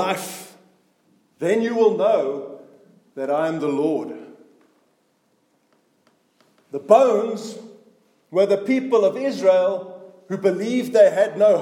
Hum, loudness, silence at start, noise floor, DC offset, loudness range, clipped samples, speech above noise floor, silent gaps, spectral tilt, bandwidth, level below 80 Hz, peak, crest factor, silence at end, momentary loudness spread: none; -20 LUFS; 0 s; -65 dBFS; under 0.1%; 8 LU; under 0.1%; 46 dB; none; -5.5 dB/octave; 16.5 kHz; -82 dBFS; 0 dBFS; 20 dB; 0 s; 19 LU